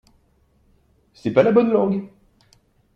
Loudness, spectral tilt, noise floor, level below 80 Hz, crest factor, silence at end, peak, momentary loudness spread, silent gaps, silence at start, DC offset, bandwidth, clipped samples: -19 LUFS; -8.5 dB/octave; -61 dBFS; -60 dBFS; 20 dB; 0.9 s; -2 dBFS; 12 LU; none; 1.25 s; under 0.1%; 7.8 kHz; under 0.1%